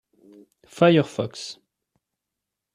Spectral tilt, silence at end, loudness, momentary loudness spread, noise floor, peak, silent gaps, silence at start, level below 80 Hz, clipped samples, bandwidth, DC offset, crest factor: -6.5 dB/octave; 1.2 s; -21 LUFS; 18 LU; -84 dBFS; -4 dBFS; none; 0.8 s; -66 dBFS; under 0.1%; 11 kHz; under 0.1%; 22 dB